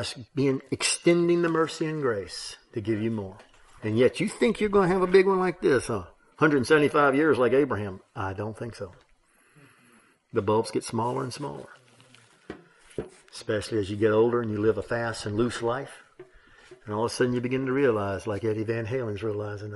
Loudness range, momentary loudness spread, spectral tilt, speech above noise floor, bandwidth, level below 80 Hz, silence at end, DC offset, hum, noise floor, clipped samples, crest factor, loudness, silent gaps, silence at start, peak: 9 LU; 16 LU; -5.5 dB/octave; 37 dB; 11.5 kHz; -58 dBFS; 0 s; under 0.1%; none; -62 dBFS; under 0.1%; 20 dB; -26 LUFS; none; 0 s; -8 dBFS